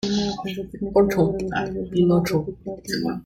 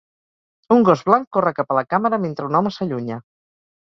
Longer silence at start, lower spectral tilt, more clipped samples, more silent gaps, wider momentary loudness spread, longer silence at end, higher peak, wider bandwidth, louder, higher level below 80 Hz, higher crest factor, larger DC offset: second, 0.05 s vs 0.7 s; second, -6.5 dB/octave vs -8 dB/octave; neither; second, none vs 1.27-1.31 s; about the same, 11 LU vs 11 LU; second, 0 s vs 0.6 s; second, -6 dBFS vs 0 dBFS; first, 16 kHz vs 7.2 kHz; second, -23 LUFS vs -19 LUFS; first, -46 dBFS vs -62 dBFS; about the same, 18 dB vs 20 dB; neither